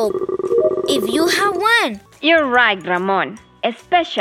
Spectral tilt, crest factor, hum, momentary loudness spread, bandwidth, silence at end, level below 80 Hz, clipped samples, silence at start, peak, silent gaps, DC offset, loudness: -3 dB/octave; 16 dB; none; 9 LU; 16.5 kHz; 0 s; -56 dBFS; under 0.1%; 0 s; -2 dBFS; none; under 0.1%; -17 LUFS